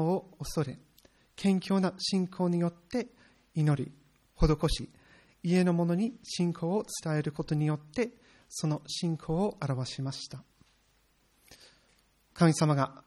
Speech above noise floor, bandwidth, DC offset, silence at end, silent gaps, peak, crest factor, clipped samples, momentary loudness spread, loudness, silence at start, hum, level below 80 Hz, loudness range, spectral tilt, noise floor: 39 dB; 13 kHz; under 0.1%; 0.1 s; none; -8 dBFS; 22 dB; under 0.1%; 11 LU; -31 LUFS; 0 s; none; -46 dBFS; 5 LU; -6 dB/octave; -69 dBFS